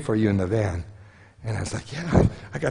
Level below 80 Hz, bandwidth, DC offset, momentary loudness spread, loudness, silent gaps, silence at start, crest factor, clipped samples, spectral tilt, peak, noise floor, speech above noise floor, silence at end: -40 dBFS; 10.5 kHz; under 0.1%; 13 LU; -25 LUFS; none; 0 s; 22 dB; under 0.1%; -7 dB/octave; -4 dBFS; -48 dBFS; 25 dB; 0 s